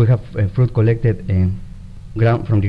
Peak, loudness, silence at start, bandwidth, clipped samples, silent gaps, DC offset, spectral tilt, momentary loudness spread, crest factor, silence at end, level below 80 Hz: -2 dBFS; -17 LUFS; 0 s; 5 kHz; under 0.1%; none; under 0.1%; -10.5 dB/octave; 16 LU; 14 dB; 0 s; -34 dBFS